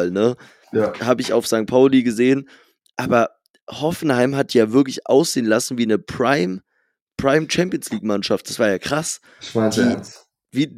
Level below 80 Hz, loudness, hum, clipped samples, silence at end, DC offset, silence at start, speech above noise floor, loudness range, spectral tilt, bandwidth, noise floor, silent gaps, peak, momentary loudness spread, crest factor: -56 dBFS; -19 LUFS; none; under 0.1%; 0 s; under 0.1%; 0 s; 51 dB; 3 LU; -5 dB/octave; 15.5 kHz; -69 dBFS; 3.50-3.54 s, 3.62-3.67 s, 7.02-7.07 s; -2 dBFS; 11 LU; 18 dB